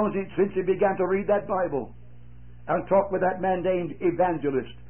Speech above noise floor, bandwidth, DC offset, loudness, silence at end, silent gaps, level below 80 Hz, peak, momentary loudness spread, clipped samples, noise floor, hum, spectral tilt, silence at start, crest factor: 23 dB; 3.3 kHz; 0.7%; -25 LUFS; 0.1 s; none; -52 dBFS; -10 dBFS; 6 LU; under 0.1%; -48 dBFS; 60 Hz at -50 dBFS; -11.5 dB/octave; 0 s; 16 dB